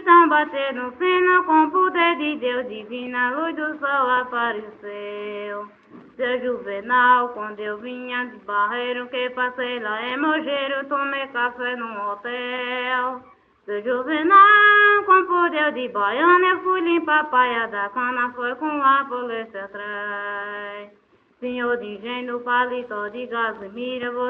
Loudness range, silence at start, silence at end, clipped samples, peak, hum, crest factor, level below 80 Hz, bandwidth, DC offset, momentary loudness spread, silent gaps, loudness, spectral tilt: 10 LU; 0 s; 0 s; under 0.1%; -2 dBFS; none; 18 dB; -68 dBFS; 4.6 kHz; under 0.1%; 15 LU; none; -20 LUFS; -6.5 dB/octave